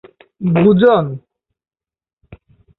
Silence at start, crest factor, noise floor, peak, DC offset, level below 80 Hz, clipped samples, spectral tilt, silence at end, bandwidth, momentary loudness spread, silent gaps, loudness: 0.4 s; 16 dB; -66 dBFS; -2 dBFS; under 0.1%; -50 dBFS; under 0.1%; -11 dB/octave; 0.45 s; 4.1 kHz; 15 LU; 2.13-2.17 s; -13 LUFS